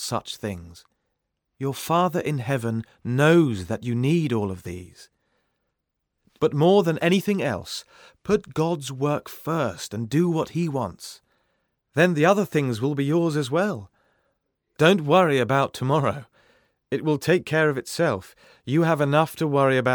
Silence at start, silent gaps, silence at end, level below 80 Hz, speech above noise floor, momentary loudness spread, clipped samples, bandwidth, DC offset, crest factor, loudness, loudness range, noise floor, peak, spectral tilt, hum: 0 s; none; 0 s; -60 dBFS; 57 dB; 13 LU; under 0.1%; over 20 kHz; under 0.1%; 20 dB; -23 LUFS; 4 LU; -79 dBFS; -4 dBFS; -6 dB/octave; none